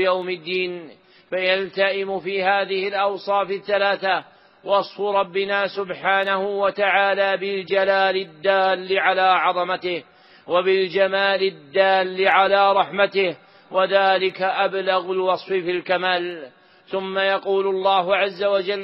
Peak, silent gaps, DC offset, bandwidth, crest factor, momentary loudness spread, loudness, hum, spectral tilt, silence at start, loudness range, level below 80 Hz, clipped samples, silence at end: -2 dBFS; none; under 0.1%; 5.8 kHz; 18 dB; 8 LU; -20 LUFS; none; -1 dB/octave; 0 s; 4 LU; -70 dBFS; under 0.1%; 0 s